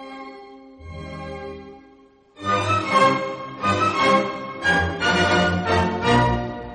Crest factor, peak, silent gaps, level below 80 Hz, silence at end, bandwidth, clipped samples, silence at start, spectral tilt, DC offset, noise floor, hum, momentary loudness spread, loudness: 18 dB; -4 dBFS; none; -42 dBFS; 0 s; 10 kHz; under 0.1%; 0 s; -5 dB/octave; under 0.1%; -52 dBFS; none; 19 LU; -20 LUFS